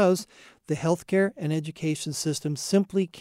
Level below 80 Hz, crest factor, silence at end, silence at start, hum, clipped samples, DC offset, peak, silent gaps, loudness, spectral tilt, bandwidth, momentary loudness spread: -66 dBFS; 16 dB; 0 s; 0 s; none; under 0.1%; under 0.1%; -10 dBFS; none; -27 LUFS; -5.5 dB/octave; 15.5 kHz; 6 LU